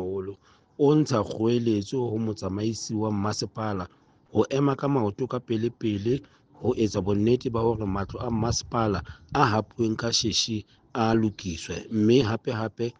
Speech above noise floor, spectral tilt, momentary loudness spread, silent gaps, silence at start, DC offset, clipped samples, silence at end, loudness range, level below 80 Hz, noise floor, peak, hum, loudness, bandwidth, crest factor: 20 dB; -5.5 dB/octave; 9 LU; none; 0 s; under 0.1%; under 0.1%; 0.1 s; 2 LU; -50 dBFS; -45 dBFS; -6 dBFS; none; -26 LUFS; 9.6 kHz; 20 dB